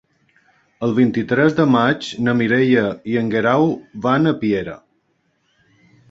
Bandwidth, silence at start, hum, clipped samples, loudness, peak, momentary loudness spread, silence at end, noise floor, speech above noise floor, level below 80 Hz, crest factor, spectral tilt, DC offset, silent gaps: 7.8 kHz; 0.8 s; none; under 0.1%; -17 LUFS; -2 dBFS; 7 LU; 1.35 s; -65 dBFS; 49 dB; -54 dBFS; 18 dB; -7 dB/octave; under 0.1%; none